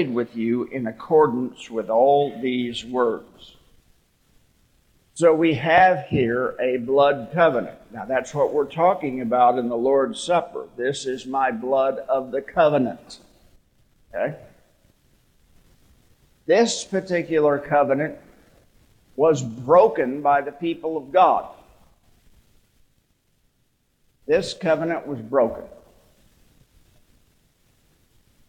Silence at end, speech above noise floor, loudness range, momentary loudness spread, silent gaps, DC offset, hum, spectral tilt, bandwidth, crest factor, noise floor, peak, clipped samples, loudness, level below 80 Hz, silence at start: 2.75 s; 46 dB; 8 LU; 11 LU; none; under 0.1%; none; -5.5 dB/octave; 10 kHz; 18 dB; -67 dBFS; -4 dBFS; under 0.1%; -21 LUFS; -58 dBFS; 0 s